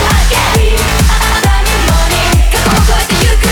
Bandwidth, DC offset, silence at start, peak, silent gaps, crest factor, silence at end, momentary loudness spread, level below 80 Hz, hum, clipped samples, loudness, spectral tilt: over 20 kHz; under 0.1%; 0 s; -2 dBFS; none; 8 dB; 0 s; 1 LU; -12 dBFS; none; under 0.1%; -10 LUFS; -4 dB/octave